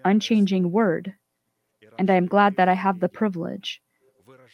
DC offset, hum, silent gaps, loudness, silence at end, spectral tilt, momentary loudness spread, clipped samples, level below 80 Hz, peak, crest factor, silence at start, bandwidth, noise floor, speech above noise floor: under 0.1%; none; none; -22 LUFS; 0.8 s; -7 dB/octave; 15 LU; under 0.1%; -72 dBFS; -4 dBFS; 18 dB; 0.05 s; 6.8 kHz; -76 dBFS; 55 dB